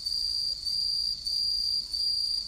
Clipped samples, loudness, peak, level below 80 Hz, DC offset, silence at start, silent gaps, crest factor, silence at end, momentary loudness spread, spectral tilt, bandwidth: under 0.1%; -26 LUFS; -20 dBFS; -54 dBFS; under 0.1%; 0 s; none; 10 dB; 0 s; 2 LU; 0.5 dB/octave; 15.5 kHz